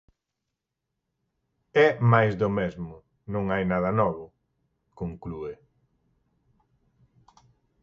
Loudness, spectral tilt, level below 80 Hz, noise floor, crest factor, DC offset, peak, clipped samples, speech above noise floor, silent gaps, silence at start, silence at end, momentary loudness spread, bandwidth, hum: -25 LUFS; -8.5 dB/octave; -54 dBFS; -84 dBFS; 24 dB; under 0.1%; -4 dBFS; under 0.1%; 60 dB; none; 1.75 s; 2.3 s; 19 LU; 7 kHz; none